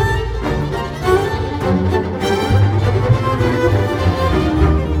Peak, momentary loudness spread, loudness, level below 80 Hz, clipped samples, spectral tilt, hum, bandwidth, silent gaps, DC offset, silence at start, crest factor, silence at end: 0 dBFS; 5 LU; -16 LUFS; -24 dBFS; under 0.1%; -7 dB/octave; none; 14 kHz; none; under 0.1%; 0 s; 14 dB; 0 s